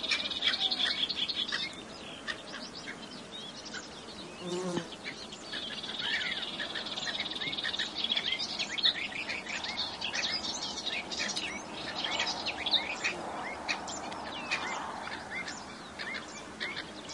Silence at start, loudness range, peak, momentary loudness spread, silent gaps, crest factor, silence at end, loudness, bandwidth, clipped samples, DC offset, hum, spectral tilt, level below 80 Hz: 0 s; 8 LU; -14 dBFS; 13 LU; none; 22 dB; 0 s; -33 LUFS; 11.5 kHz; under 0.1%; under 0.1%; none; -1.5 dB/octave; -66 dBFS